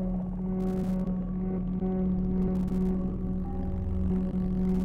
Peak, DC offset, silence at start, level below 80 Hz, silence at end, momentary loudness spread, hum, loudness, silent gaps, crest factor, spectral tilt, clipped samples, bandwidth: -18 dBFS; under 0.1%; 0 s; -36 dBFS; 0 s; 4 LU; none; -30 LUFS; none; 10 dB; -11 dB/octave; under 0.1%; 3.1 kHz